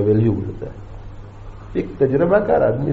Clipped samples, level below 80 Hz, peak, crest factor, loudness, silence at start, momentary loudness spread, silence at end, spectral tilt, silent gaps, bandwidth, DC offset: under 0.1%; -38 dBFS; -4 dBFS; 16 dB; -18 LUFS; 0 s; 23 LU; 0 s; -9 dB/octave; none; 4.6 kHz; under 0.1%